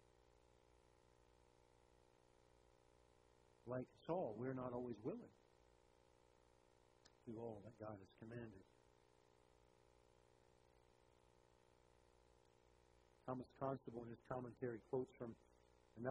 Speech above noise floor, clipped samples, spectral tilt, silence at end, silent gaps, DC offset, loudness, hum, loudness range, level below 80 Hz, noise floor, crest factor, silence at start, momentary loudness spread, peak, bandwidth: 24 dB; under 0.1%; -8.5 dB/octave; 0 s; none; under 0.1%; -51 LUFS; 60 Hz at -80 dBFS; 10 LU; -80 dBFS; -75 dBFS; 24 dB; 3.65 s; 13 LU; -30 dBFS; 11 kHz